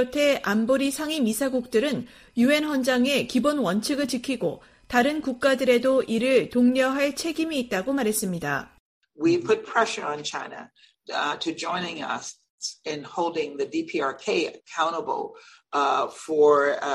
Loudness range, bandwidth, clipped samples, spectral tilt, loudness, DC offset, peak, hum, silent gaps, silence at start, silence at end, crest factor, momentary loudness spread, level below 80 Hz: 6 LU; 15.5 kHz; under 0.1%; -4 dB/octave; -24 LUFS; under 0.1%; -6 dBFS; none; 8.80-9.01 s, 12.50-12.58 s; 0 s; 0 s; 18 dB; 11 LU; -60 dBFS